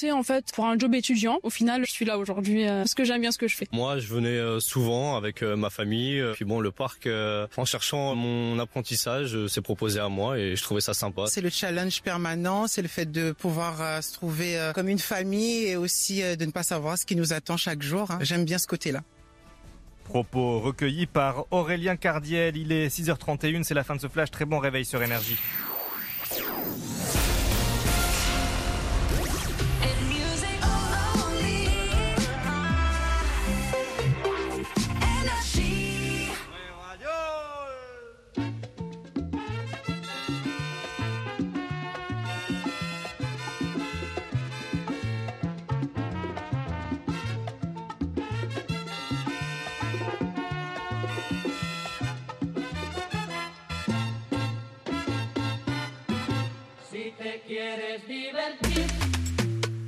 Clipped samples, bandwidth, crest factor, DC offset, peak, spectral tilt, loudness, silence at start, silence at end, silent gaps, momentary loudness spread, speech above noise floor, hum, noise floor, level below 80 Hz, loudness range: under 0.1%; 15.5 kHz; 18 dB; under 0.1%; -10 dBFS; -4.5 dB/octave; -28 LUFS; 0 s; 0 s; none; 8 LU; 25 dB; none; -53 dBFS; -38 dBFS; 6 LU